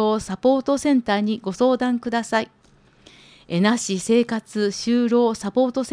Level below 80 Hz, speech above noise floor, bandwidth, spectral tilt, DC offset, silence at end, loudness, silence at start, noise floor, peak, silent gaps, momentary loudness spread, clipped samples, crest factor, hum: -56 dBFS; 34 dB; 10.5 kHz; -5 dB/octave; under 0.1%; 0 s; -21 LUFS; 0 s; -55 dBFS; -6 dBFS; none; 5 LU; under 0.1%; 14 dB; none